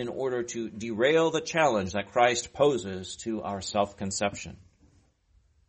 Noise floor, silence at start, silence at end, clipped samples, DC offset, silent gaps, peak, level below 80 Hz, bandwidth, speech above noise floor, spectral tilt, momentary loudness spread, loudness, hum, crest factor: -65 dBFS; 0 s; 1.15 s; under 0.1%; under 0.1%; none; -10 dBFS; -60 dBFS; 8.8 kHz; 37 dB; -4 dB/octave; 11 LU; -28 LUFS; none; 20 dB